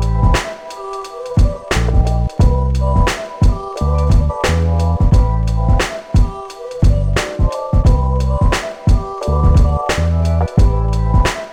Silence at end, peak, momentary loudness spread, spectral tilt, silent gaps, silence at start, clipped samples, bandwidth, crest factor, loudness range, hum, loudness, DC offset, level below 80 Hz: 0 s; -2 dBFS; 6 LU; -6.5 dB/octave; none; 0 s; under 0.1%; 11.5 kHz; 10 dB; 1 LU; none; -16 LUFS; under 0.1%; -16 dBFS